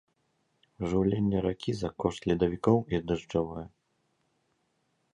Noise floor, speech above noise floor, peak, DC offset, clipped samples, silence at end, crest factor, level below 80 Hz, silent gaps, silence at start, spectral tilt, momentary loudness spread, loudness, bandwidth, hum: -75 dBFS; 46 dB; -10 dBFS; under 0.1%; under 0.1%; 1.45 s; 22 dB; -50 dBFS; none; 0.8 s; -7.5 dB/octave; 10 LU; -30 LUFS; 10.5 kHz; none